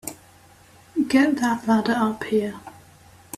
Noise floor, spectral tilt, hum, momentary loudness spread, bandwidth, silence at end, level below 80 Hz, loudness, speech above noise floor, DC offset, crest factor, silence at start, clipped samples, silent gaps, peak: -51 dBFS; -5 dB/octave; none; 13 LU; 15.5 kHz; 0.65 s; -60 dBFS; -22 LUFS; 30 dB; under 0.1%; 18 dB; 0.05 s; under 0.1%; none; -6 dBFS